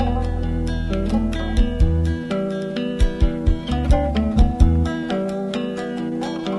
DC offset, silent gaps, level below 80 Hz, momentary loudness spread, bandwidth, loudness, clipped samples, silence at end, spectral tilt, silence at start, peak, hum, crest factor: under 0.1%; none; -22 dBFS; 7 LU; 11.5 kHz; -22 LUFS; under 0.1%; 0 s; -7.5 dB/octave; 0 s; -2 dBFS; none; 18 dB